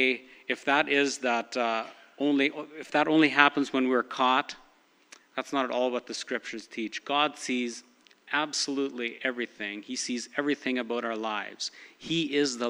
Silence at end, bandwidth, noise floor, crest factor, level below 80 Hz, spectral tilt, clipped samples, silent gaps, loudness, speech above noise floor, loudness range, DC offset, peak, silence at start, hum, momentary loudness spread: 0 s; 11.5 kHz; -62 dBFS; 28 dB; -80 dBFS; -3 dB/octave; under 0.1%; none; -28 LUFS; 34 dB; 6 LU; under 0.1%; -2 dBFS; 0 s; none; 13 LU